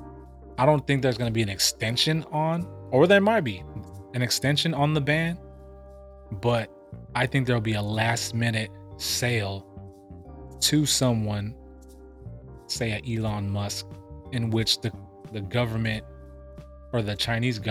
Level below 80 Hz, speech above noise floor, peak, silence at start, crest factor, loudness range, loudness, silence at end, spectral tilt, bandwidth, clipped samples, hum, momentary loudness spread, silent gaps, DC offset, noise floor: -50 dBFS; 22 dB; -6 dBFS; 0 s; 20 dB; 6 LU; -25 LUFS; 0 s; -4.5 dB/octave; 15.5 kHz; under 0.1%; none; 22 LU; none; under 0.1%; -47 dBFS